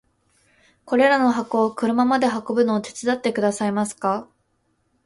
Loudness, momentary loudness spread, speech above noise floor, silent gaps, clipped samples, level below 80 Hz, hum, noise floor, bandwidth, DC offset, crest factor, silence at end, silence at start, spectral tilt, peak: -21 LUFS; 7 LU; 48 dB; none; under 0.1%; -64 dBFS; none; -68 dBFS; 11.5 kHz; under 0.1%; 16 dB; 0.8 s; 0.85 s; -5 dB/octave; -6 dBFS